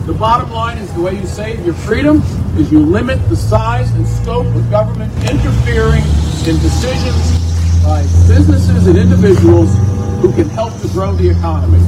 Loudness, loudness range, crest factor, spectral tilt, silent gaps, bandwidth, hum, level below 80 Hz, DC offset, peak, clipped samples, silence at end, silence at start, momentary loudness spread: -12 LUFS; 4 LU; 10 dB; -7.5 dB/octave; none; 11.5 kHz; none; -20 dBFS; under 0.1%; 0 dBFS; 0.6%; 0 s; 0 s; 9 LU